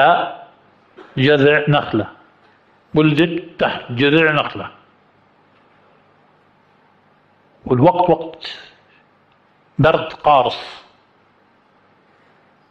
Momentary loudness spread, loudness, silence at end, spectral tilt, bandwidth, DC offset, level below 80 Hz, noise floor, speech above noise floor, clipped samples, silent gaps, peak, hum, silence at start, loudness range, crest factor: 18 LU; -16 LUFS; 1.9 s; -7.5 dB/octave; 7.8 kHz; under 0.1%; -52 dBFS; -55 dBFS; 40 dB; under 0.1%; none; -2 dBFS; none; 0 s; 4 LU; 18 dB